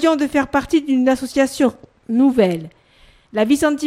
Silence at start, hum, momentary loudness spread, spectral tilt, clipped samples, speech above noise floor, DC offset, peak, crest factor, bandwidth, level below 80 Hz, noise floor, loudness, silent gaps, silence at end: 0 s; none; 6 LU; -5 dB/octave; under 0.1%; 35 dB; under 0.1%; -2 dBFS; 16 dB; 15.5 kHz; -48 dBFS; -51 dBFS; -18 LUFS; none; 0 s